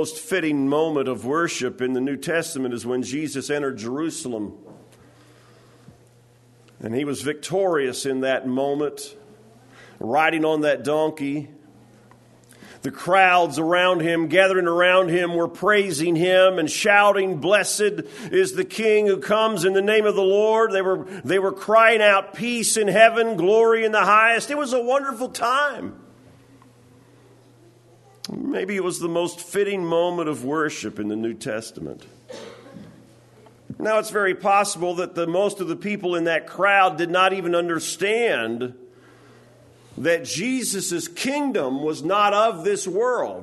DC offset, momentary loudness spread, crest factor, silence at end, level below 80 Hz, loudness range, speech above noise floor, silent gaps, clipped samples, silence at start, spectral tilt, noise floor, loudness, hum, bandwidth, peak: under 0.1%; 12 LU; 20 dB; 0 s; -68 dBFS; 11 LU; 33 dB; none; under 0.1%; 0 s; -3.5 dB/octave; -54 dBFS; -21 LUFS; none; 12.5 kHz; 0 dBFS